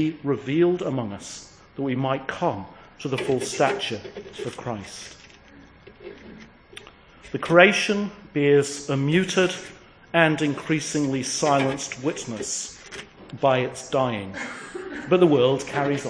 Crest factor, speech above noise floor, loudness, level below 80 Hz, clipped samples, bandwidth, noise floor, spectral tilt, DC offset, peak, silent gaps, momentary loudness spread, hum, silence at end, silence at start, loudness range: 24 dB; 26 dB; -23 LUFS; -58 dBFS; under 0.1%; 10.5 kHz; -49 dBFS; -4.5 dB/octave; under 0.1%; 0 dBFS; none; 20 LU; none; 0 s; 0 s; 8 LU